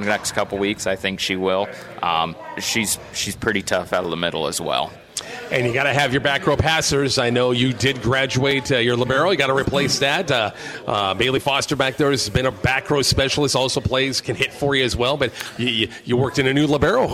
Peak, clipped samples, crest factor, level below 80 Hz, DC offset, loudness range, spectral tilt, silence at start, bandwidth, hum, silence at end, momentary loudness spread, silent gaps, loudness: -2 dBFS; under 0.1%; 18 dB; -42 dBFS; under 0.1%; 4 LU; -4 dB/octave; 0 s; 16 kHz; none; 0 s; 6 LU; none; -20 LUFS